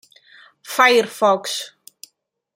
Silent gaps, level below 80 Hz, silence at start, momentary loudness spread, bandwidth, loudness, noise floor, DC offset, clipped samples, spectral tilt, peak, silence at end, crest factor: none; -78 dBFS; 0.65 s; 13 LU; 16.5 kHz; -17 LUFS; -66 dBFS; under 0.1%; under 0.1%; -2 dB/octave; -2 dBFS; 0.9 s; 20 dB